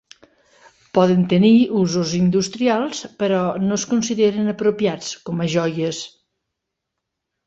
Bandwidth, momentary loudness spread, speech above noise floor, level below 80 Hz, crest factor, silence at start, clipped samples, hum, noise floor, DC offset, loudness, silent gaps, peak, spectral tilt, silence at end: 8 kHz; 10 LU; 62 dB; -58 dBFS; 18 dB; 0.95 s; under 0.1%; none; -80 dBFS; under 0.1%; -19 LUFS; none; -2 dBFS; -5.5 dB/octave; 1.4 s